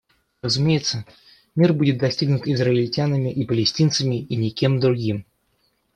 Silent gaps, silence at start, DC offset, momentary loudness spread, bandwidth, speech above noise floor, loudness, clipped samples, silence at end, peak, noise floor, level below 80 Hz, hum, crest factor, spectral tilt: none; 0.45 s; under 0.1%; 7 LU; 9.4 kHz; 47 dB; -21 LUFS; under 0.1%; 0.75 s; -6 dBFS; -67 dBFS; -56 dBFS; none; 16 dB; -6 dB/octave